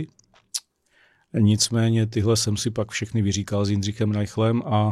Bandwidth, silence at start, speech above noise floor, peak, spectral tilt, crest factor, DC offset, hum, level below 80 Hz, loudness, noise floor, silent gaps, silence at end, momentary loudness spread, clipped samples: 13 kHz; 0 s; 40 dB; -6 dBFS; -5 dB/octave; 16 dB; under 0.1%; none; -54 dBFS; -23 LUFS; -62 dBFS; none; 0 s; 12 LU; under 0.1%